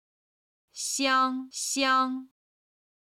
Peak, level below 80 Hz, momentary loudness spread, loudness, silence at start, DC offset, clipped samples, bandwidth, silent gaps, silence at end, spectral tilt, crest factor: -12 dBFS; -76 dBFS; 12 LU; -26 LUFS; 0.75 s; under 0.1%; under 0.1%; 16 kHz; none; 0.8 s; 0.5 dB/octave; 18 dB